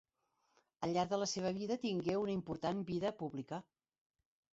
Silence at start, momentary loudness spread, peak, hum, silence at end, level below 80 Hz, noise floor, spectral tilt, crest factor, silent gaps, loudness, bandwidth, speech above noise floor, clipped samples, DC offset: 0.8 s; 9 LU; -22 dBFS; none; 0.9 s; -72 dBFS; -82 dBFS; -5.5 dB/octave; 18 dB; none; -39 LUFS; 8 kHz; 43 dB; under 0.1%; under 0.1%